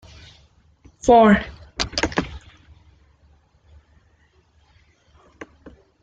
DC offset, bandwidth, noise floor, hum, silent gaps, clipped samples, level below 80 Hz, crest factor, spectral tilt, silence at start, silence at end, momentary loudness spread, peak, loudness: under 0.1%; 9 kHz; -59 dBFS; none; none; under 0.1%; -44 dBFS; 22 dB; -5 dB/octave; 1.05 s; 3.65 s; 30 LU; -2 dBFS; -18 LUFS